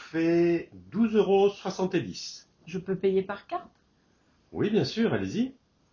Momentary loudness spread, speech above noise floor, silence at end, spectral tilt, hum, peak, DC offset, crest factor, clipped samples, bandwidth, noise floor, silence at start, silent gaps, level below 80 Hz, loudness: 14 LU; 40 dB; 0.4 s; -6.5 dB/octave; none; -12 dBFS; under 0.1%; 16 dB; under 0.1%; 7.2 kHz; -66 dBFS; 0 s; none; -62 dBFS; -28 LUFS